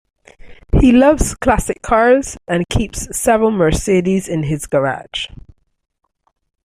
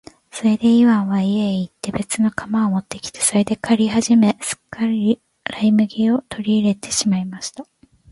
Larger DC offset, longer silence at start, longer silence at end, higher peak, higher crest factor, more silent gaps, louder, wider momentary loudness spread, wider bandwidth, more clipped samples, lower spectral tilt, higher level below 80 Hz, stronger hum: neither; about the same, 0.45 s vs 0.35 s; first, 1.3 s vs 0.5 s; about the same, -2 dBFS vs -4 dBFS; about the same, 14 dB vs 16 dB; neither; first, -15 LUFS vs -18 LUFS; about the same, 10 LU vs 11 LU; first, 15.5 kHz vs 11.5 kHz; neither; about the same, -5.5 dB/octave vs -5 dB/octave; first, -28 dBFS vs -54 dBFS; neither